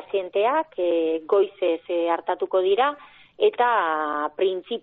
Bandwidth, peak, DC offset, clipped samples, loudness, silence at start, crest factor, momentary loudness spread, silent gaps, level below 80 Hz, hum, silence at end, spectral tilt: 4.1 kHz; -8 dBFS; under 0.1%; under 0.1%; -23 LUFS; 0 s; 14 dB; 5 LU; none; -72 dBFS; none; 0 s; -0.5 dB/octave